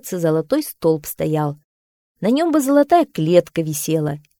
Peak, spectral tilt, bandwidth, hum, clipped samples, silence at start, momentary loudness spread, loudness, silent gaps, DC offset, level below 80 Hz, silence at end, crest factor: 0 dBFS; -6 dB/octave; 19 kHz; none; under 0.1%; 0.05 s; 8 LU; -18 LUFS; 1.64-2.15 s; under 0.1%; -56 dBFS; 0.2 s; 18 dB